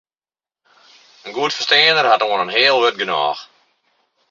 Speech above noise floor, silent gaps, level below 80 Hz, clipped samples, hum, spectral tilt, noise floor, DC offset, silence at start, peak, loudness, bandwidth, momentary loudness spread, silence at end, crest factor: over 74 dB; none; -70 dBFS; under 0.1%; none; -2 dB/octave; under -90 dBFS; under 0.1%; 1.25 s; 0 dBFS; -15 LUFS; 7.6 kHz; 15 LU; 0.85 s; 18 dB